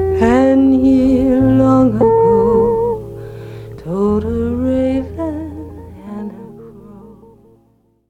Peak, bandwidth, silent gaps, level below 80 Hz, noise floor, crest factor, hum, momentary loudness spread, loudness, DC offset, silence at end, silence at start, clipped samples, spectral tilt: 0 dBFS; 8.2 kHz; none; -34 dBFS; -56 dBFS; 14 dB; 60 Hz at -45 dBFS; 20 LU; -13 LUFS; under 0.1%; 1 s; 0 s; under 0.1%; -9 dB/octave